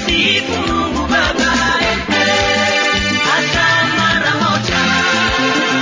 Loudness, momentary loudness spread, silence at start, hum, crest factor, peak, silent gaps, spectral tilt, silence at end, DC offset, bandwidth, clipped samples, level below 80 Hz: -13 LUFS; 3 LU; 0 s; none; 12 dB; -2 dBFS; none; -3 dB/octave; 0 s; under 0.1%; 7.6 kHz; under 0.1%; -32 dBFS